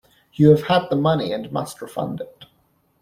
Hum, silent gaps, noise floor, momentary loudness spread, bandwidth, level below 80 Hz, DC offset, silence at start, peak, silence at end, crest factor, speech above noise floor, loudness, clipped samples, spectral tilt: none; none; -63 dBFS; 17 LU; 14.5 kHz; -54 dBFS; under 0.1%; 0.4 s; -2 dBFS; 0.6 s; 18 dB; 44 dB; -20 LUFS; under 0.1%; -7 dB/octave